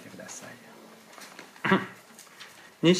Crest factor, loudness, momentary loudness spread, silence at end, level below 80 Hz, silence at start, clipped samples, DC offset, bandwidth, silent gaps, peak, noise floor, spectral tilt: 22 dB; -30 LUFS; 23 LU; 0 s; -78 dBFS; 0.05 s; under 0.1%; under 0.1%; 15.5 kHz; none; -8 dBFS; -50 dBFS; -5 dB/octave